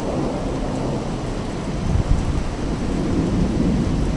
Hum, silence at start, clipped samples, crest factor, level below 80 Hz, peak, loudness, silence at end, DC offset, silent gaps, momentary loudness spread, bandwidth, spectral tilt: none; 0 s; under 0.1%; 18 dB; -26 dBFS; -4 dBFS; -23 LUFS; 0 s; under 0.1%; none; 6 LU; 11.5 kHz; -7 dB/octave